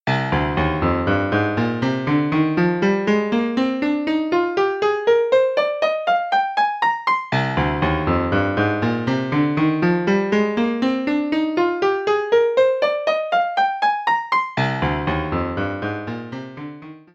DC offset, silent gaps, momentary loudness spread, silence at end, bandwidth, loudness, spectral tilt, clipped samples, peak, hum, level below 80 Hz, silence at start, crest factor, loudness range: under 0.1%; none; 5 LU; 0.15 s; 7.6 kHz; -20 LUFS; -7 dB/octave; under 0.1%; -6 dBFS; none; -40 dBFS; 0.05 s; 14 dB; 1 LU